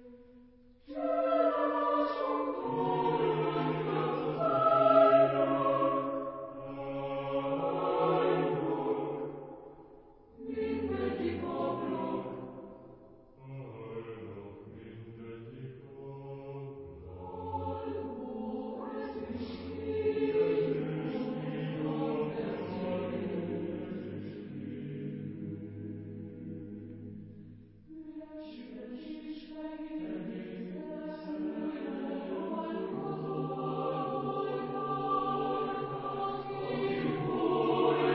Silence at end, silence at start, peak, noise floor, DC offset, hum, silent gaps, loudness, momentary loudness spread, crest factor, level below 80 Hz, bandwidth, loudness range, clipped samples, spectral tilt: 0 s; 0 s; -12 dBFS; -58 dBFS; under 0.1%; none; none; -33 LUFS; 18 LU; 22 dB; -62 dBFS; 5.6 kHz; 18 LU; under 0.1%; -6 dB/octave